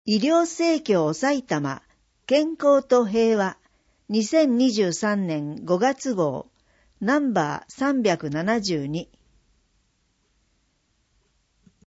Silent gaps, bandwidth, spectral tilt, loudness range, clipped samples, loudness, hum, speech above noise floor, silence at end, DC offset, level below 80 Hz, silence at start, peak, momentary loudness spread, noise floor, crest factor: none; 8 kHz; -5 dB/octave; 7 LU; under 0.1%; -23 LUFS; none; 47 dB; 2.85 s; under 0.1%; -64 dBFS; 0.05 s; -6 dBFS; 9 LU; -69 dBFS; 18 dB